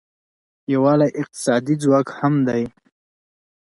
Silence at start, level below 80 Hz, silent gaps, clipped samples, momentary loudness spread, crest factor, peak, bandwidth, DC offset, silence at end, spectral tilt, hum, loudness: 0.7 s; -62 dBFS; none; under 0.1%; 8 LU; 16 dB; -4 dBFS; 11.5 kHz; under 0.1%; 0.95 s; -7 dB/octave; none; -19 LUFS